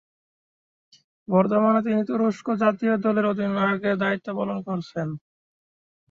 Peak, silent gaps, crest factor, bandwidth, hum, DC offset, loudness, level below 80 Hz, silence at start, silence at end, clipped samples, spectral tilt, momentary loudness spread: -6 dBFS; none; 18 dB; 7.2 kHz; none; under 0.1%; -23 LUFS; -68 dBFS; 1.3 s; 0.9 s; under 0.1%; -8 dB/octave; 10 LU